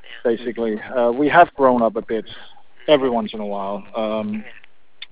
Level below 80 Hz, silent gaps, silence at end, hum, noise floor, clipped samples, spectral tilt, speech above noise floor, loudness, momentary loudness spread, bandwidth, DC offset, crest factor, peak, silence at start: -56 dBFS; none; 0.55 s; none; -42 dBFS; under 0.1%; -9 dB/octave; 23 dB; -19 LUFS; 16 LU; 4 kHz; 1%; 20 dB; 0 dBFS; 0.1 s